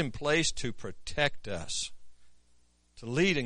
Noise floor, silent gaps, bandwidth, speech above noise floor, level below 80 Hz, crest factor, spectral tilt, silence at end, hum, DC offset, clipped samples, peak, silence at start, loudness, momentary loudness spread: -65 dBFS; none; 10.5 kHz; 34 dB; -50 dBFS; 22 dB; -3.5 dB/octave; 0 s; 60 Hz at -65 dBFS; under 0.1%; under 0.1%; -10 dBFS; 0 s; -32 LUFS; 12 LU